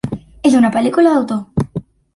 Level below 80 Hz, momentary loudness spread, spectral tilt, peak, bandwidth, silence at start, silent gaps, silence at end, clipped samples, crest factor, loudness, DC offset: -44 dBFS; 13 LU; -7 dB/octave; -2 dBFS; 11.5 kHz; 0.05 s; none; 0.35 s; under 0.1%; 12 dB; -15 LUFS; under 0.1%